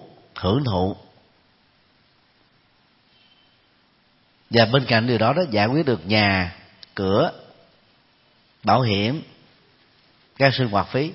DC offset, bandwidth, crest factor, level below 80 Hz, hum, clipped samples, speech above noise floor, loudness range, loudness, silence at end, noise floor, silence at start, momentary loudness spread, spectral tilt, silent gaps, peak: under 0.1%; 5.8 kHz; 24 dB; -54 dBFS; none; under 0.1%; 41 dB; 9 LU; -21 LUFS; 0 s; -60 dBFS; 0 s; 11 LU; -9.5 dB/octave; none; 0 dBFS